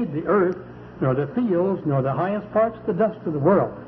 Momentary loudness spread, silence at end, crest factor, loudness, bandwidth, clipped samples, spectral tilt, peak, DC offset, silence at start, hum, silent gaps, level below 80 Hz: 5 LU; 0 s; 14 dB; -22 LUFS; 5.2 kHz; under 0.1%; -11.5 dB/octave; -8 dBFS; under 0.1%; 0 s; none; none; -54 dBFS